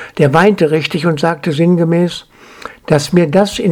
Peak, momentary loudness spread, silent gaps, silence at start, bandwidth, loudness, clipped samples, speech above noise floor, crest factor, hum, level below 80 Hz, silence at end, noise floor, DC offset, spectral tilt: 0 dBFS; 16 LU; none; 0 s; 14.5 kHz; -12 LUFS; 0.1%; 22 dB; 12 dB; none; -46 dBFS; 0 s; -33 dBFS; under 0.1%; -6.5 dB/octave